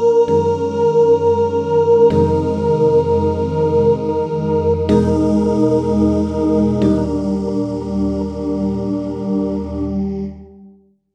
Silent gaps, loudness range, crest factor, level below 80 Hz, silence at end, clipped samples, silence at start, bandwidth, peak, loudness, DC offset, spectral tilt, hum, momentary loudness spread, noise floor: none; 6 LU; 14 dB; -36 dBFS; 0.45 s; under 0.1%; 0 s; 8.6 kHz; -2 dBFS; -16 LUFS; under 0.1%; -9 dB/octave; none; 8 LU; -47 dBFS